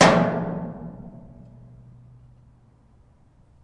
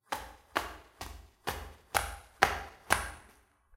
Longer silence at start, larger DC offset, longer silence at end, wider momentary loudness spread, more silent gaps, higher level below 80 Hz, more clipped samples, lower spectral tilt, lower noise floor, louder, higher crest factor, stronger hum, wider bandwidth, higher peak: about the same, 0 s vs 0.1 s; neither; first, 2.45 s vs 0.5 s; first, 28 LU vs 17 LU; neither; about the same, -52 dBFS vs -50 dBFS; neither; first, -5 dB/octave vs -2 dB/octave; second, -56 dBFS vs -63 dBFS; first, -23 LUFS vs -34 LUFS; second, 24 dB vs 36 dB; neither; second, 11.5 kHz vs 17 kHz; about the same, -2 dBFS vs 0 dBFS